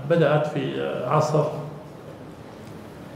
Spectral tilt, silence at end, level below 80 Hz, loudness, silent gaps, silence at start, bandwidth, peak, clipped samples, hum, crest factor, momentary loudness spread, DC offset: -7 dB/octave; 0 s; -60 dBFS; -23 LUFS; none; 0 s; 12.5 kHz; -6 dBFS; under 0.1%; none; 18 dB; 21 LU; under 0.1%